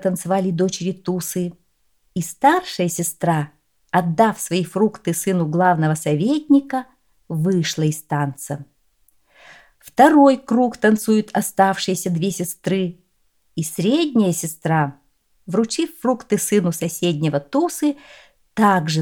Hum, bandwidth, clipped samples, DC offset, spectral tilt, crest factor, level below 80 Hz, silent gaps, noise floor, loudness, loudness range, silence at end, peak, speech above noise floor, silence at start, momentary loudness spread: none; 19.5 kHz; under 0.1%; under 0.1%; -5.5 dB/octave; 18 dB; -62 dBFS; none; -66 dBFS; -19 LUFS; 5 LU; 0 s; 0 dBFS; 47 dB; 0 s; 11 LU